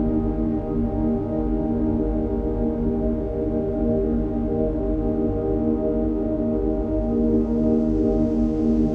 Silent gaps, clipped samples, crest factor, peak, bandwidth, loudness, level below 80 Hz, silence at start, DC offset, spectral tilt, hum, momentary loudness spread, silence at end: none; under 0.1%; 12 dB; -10 dBFS; 3.6 kHz; -23 LUFS; -30 dBFS; 0 s; under 0.1%; -11.5 dB/octave; none; 4 LU; 0 s